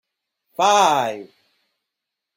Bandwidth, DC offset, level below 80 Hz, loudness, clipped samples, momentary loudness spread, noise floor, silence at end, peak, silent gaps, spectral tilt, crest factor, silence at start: 16 kHz; under 0.1%; -72 dBFS; -18 LUFS; under 0.1%; 21 LU; -83 dBFS; 1.1 s; -4 dBFS; none; -2 dB/octave; 18 dB; 0.6 s